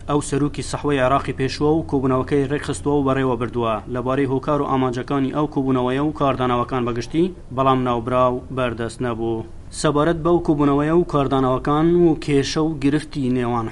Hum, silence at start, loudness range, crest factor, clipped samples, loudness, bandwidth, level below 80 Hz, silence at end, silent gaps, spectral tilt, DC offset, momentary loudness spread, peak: none; 0 s; 3 LU; 16 dB; under 0.1%; -20 LUFS; 11.5 kHz; -38 dBFS; 0 s; none; -6.5 dB/octave; under 0.1%; 6 LU; -4 dBFS